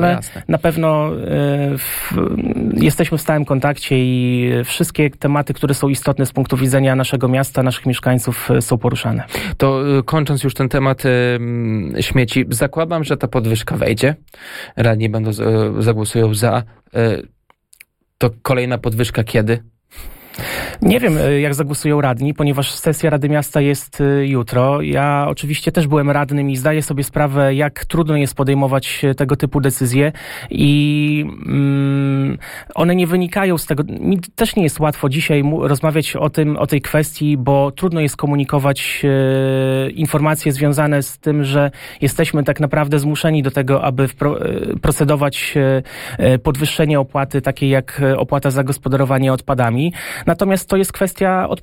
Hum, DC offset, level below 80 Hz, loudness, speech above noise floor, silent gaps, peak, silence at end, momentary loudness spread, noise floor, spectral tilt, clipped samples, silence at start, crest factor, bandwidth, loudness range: none; under 0.1%; -38 dBFS; -16 LUFS; 33 dB; none; -2 dBFS; 0.05 s; 4 LU; -49 dBFS; -6 dB/octave; under 0.1%; 0 s; 14 dB; 16.5 kHz; 2 LU